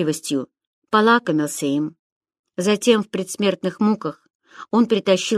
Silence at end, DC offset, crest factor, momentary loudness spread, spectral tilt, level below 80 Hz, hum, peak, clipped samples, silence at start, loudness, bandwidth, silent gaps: 0 s; under 0.1%; 20 dB; 10 LU; -4.5 dB/octave; -70 dBFS; none; -2 dBFS; under 0.1%; 0 s; -20 LUFS; 14 kHz; 0.67-0.82 s, 1.99-2.21 s, 2.39-2.44 s, 4.30-4.40 s